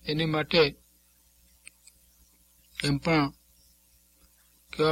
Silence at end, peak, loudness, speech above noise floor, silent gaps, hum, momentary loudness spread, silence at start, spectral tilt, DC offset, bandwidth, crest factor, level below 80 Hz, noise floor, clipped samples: 0 s; -10 dBFS; -27 LUFS; 37 dB; none; 60 Hz at -60 dBFS; 12 LU; 0.05 s; -5.5 dB/octave; under 0.1%; 16.5 kHz; 22 dB; -56 dBFS; -63 dBFS; under 0.1%